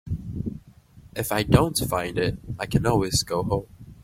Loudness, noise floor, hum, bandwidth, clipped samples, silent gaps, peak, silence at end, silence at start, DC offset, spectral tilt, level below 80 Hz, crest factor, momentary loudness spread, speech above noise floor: -25 LUFS; -50 dBFS; none; 16.5 kHz; under 0.1%; none; -2 dBFS; 0.1 s; 0.05 s; under 0.1%; -5 dB/octave; -40 dBFS; 22 dB; 13 LU; 27 dB